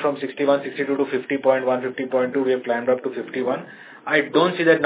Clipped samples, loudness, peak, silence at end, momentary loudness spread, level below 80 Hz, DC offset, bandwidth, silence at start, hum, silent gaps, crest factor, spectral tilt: under 0.1%; -22 LUFS; -4 dBFS; 0 s; 8 LU; -76 dBFS; under 0.1%; 4 kHz; 0 s; none; none; 18 dB; -9.5 dB/octave